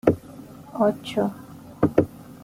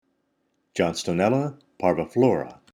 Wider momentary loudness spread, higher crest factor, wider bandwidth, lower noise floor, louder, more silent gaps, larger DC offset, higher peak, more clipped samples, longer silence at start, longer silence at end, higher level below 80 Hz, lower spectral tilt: first, 21 LU vs 8 LU; about the same, 22 dB vs 18 dB; about the same, 16 kHz vs 15.5 kHz; second, -42 dBFS vs -72 dBFS; about the same, -25 LUFS vs -24 LUFS; neither; neither; first, -2 dBFS vs -6 dBFS; neither; second, 0.05 s vs 0.75 s; second, 0.05 s vs 0.2 s; about the same, -54 dBFS vs -58 dBFS; first, -7.5 dB/octave vs -6 dB/octave